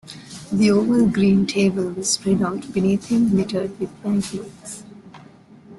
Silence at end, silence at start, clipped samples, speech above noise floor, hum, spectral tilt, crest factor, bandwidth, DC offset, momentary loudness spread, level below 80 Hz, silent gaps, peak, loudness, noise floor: 0 s; 0.05 s; under 0.1%; 27 dB; none; -5.5 dB/octave; 14 dB; 12 kHz; under 0.1%; 18 LU; -54 dBFS; none; -6 dBFS; -20 LUFS; -46 dBFS